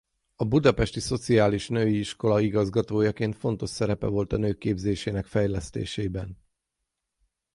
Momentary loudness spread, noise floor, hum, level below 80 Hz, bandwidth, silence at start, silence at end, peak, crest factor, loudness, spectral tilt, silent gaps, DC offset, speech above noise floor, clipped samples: 9 LU; -83 dBFS; none; -44 dBFS; 11.5 kHz; 0.4 s; 1.2 s; -4 dBFS; 22 dB; -26 LUFS; -6.5 dB/octave; none; under 0.1%; 57 dB; under 0.1%